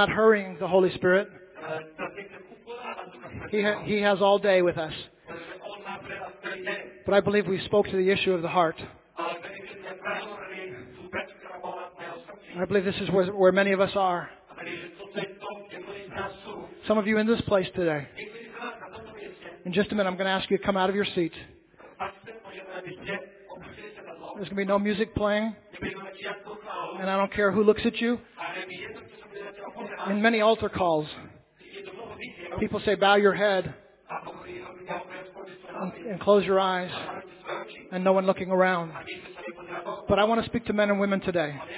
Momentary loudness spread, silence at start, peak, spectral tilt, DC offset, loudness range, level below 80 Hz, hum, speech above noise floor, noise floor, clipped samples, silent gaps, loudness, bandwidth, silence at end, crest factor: 19 LU; 0 s; -8 dBFS; -9.5 dB/octave; under 0.1%; 6 LU; -56 dBFS; none; 26 dB; -51 dBFS; under 0.1%; none; -26 LUFS; 4 kHz; 0 s; 20 dB